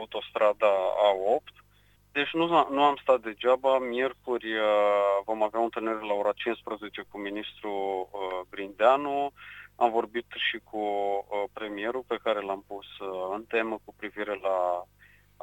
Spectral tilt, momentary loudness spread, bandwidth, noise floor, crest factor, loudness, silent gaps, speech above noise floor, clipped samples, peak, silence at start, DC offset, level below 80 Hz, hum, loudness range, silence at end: -5 dB/octave; 12 LU; 16.5 kHz; -62 dBFS; 20 dB; -28 LUFS; none; 34 dB; under 0.1%; -8 dBFS; 0 s; under 0.1%; -66 dBFS; 50 Hz at -65 dBFS; 6 LU; 0.6 s